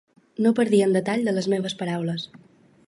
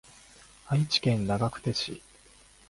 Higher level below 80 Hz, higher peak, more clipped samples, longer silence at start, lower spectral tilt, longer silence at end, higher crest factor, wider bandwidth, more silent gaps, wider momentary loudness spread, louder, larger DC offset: second, -68 dBFS vs -56 dBFS; first, -8 dBFS vs -12 dBFS; neither; second, 0.4 s vs 0.65 s; about the same, -6 dB/octave vs -5.5 dB/octave; second, 0.5 s vs 0.7 s; about the same, 16 dB vs 20 dB; about the same, 11.5 kHz vs 11.5 kHz; neither; first, 13 LU vs 9 LU; first, -23 LUFS vs -28 LUFS; neither